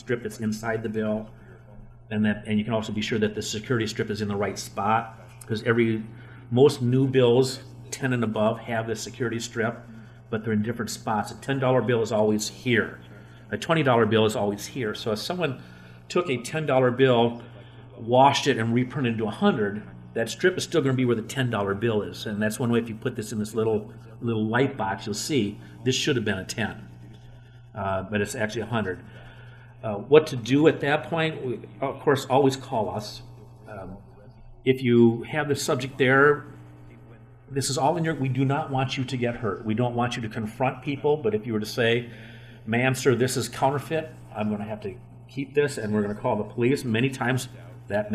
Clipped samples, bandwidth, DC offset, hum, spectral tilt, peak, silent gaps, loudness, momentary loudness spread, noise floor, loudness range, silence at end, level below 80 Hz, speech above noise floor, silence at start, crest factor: under 0.1%; 15 kHz; under 0.1%; 60 Hz at -45 dBFS; -5.5 dB/octave; -2 dBFS; none; -25 LUFS; 16 LU; -48 dBFS; 5 LU; 0 s; -56 dBFS; 24 dB; 0.05 s; 22 dB